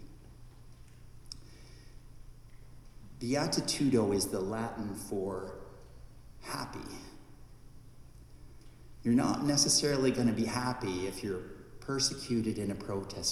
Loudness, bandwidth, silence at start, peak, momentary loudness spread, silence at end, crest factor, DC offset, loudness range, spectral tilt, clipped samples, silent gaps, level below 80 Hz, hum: -32 LUFS; 15.5 kHz; 0 s; -14 dBFS; 21 LU; 0 s; 20 dB; under 0.1%; 14 LU; -4 dB/octave; under 0.1%; none; -54 dBFS; none